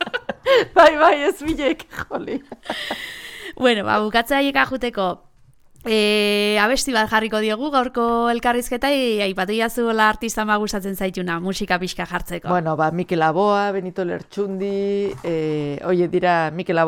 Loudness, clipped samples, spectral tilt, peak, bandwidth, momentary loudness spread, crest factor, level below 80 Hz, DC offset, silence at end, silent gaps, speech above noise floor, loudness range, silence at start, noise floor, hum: -20 LUFS; under 0.1%; -4.5 dB/octave; -2 dBFS; 18 kHz; 10 LU; 18 dB; -46 dBFS; under 0.1%; 0 s; none; 31 dB; 3 LU; 0 s; -50 dBFS; none